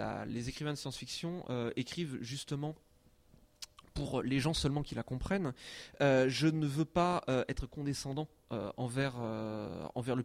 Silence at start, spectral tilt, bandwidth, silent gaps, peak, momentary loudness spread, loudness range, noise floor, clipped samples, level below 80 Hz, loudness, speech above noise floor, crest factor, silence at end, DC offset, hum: 0 s; -5.5 dB/octave; 15.5 kHz; none; -18 dBFS; 11 LU; 7 LU; -65 dBFS; under 0.1%; -54 dBFS; -36 LUFS; 29 dB; 18 dB; 0 s; under 0.1%; none